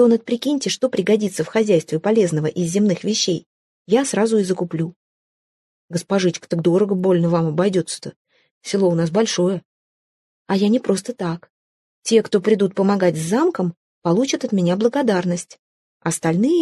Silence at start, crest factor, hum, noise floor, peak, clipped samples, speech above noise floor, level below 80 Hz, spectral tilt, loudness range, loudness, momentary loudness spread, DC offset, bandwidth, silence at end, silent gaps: 0 s; 16 dB; none; under -90 dBFS; -4 dBFS; under 0.1%; over 72 dB; -64 dBFS; -5.5 dB/octave; 3 LU; -19 LUFS; 10 LU; under 0.1%; 12.5 kHz; 0 s; 3.46-3.85 s, 4.96-5.88 s, 8.16-8.25 s, 8.51-8.61 s, 9.65-10.46 s, 11.50-12.02 s, 13.77-14.02 s, 15.59-16.00 s